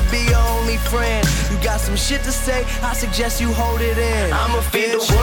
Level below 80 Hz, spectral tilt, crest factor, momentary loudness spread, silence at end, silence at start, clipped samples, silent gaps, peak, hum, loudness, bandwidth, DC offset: -20 dBFS; -4 dB/octave; 12 dB; 4 LU; 0 s; 0 s; under 0.1%; none; -6 dBFS; none; -19 LUFS; 19 kHz; under 0.1%